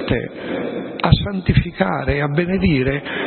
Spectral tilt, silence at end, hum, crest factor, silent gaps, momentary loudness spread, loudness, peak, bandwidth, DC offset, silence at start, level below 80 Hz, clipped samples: -12 dB/octave; 0 s; none; 18 dB; none; 8 LU; -19 LUFS; 0 dBFS; 4.4 kHz; under 0.1%; 0 s; -32 dBFS; under 0.1%